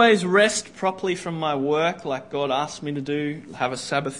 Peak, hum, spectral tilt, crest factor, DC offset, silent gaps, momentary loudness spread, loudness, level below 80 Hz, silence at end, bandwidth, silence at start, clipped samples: -4 dBFS; none; -4 dB/octave; 20 dB; 0.1%; none; 10 LU; -24 LUFS; -62 dBFS; 0 s; 11 kHz; 0 s; under 0.1%